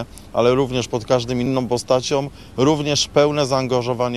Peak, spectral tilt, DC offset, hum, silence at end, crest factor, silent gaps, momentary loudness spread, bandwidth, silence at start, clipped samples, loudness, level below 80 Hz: -2 dBFS; -5 dB/octave; 0.3%; none; 0 s; 18 dB; none; 6 LU; 13.5 kHz; 0 s; under 0.1%; -19 LUFS; -46 dBFS